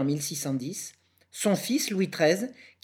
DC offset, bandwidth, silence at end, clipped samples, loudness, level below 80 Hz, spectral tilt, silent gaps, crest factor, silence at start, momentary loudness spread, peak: under 0.1%; over 20 kHz; 0.15 s; under 0.1%; -28 LUFS; -80 dBFS; -4.5 dB/octave; none; 20 dB; 0 s; 13 LU; -10 dBFS